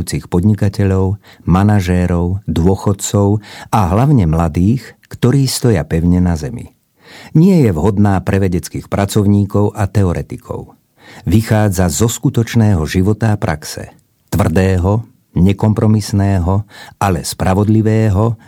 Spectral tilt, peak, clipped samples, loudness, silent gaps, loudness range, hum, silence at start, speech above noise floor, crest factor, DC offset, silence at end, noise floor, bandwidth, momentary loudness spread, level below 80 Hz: -7 dB/octave; 0 dBFS; under 0.1%; -14 LUFS; none; 2 LU; none; 0 s; 27 dB; 14 dB; under 0.1%; 0.1 s; -40 dBFS; 16.5 kHz; 9 LU; -32 dBFS